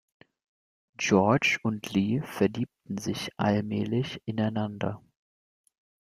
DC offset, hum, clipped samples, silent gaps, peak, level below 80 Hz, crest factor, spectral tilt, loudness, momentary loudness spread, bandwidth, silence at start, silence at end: under 0.1%; none; under 0.1%; none; -8 dBFS; -64 dBFS; 22 dB; -5.5 dB/octave; -28 LUFS; 11 LU; 15 kHz; 1 s; 1.15 s